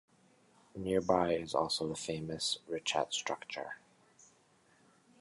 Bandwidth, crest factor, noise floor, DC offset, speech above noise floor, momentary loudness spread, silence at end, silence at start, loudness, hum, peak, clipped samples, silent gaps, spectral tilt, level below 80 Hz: 11.5 kHz; 24 dB; -68 dBFS; under 0.1%; 33 dB; 12 LU; 1.45 s; 0.75 s; -35 LUFS; none; -14 dBFS; under 0.1%; none; -3.5 dB/octave; -66 dBFS